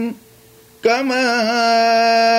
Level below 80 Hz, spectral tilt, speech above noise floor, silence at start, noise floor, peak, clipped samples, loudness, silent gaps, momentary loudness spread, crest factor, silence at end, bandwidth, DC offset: -66 dBFS; -3 dB/octave; 32 dB; 0 s; -47 dBFS; -4 dBFS; under 0.1%; -15 LUFS; none; 6 LU; 12 dB; 0 s; 16 kHz; under 0.1%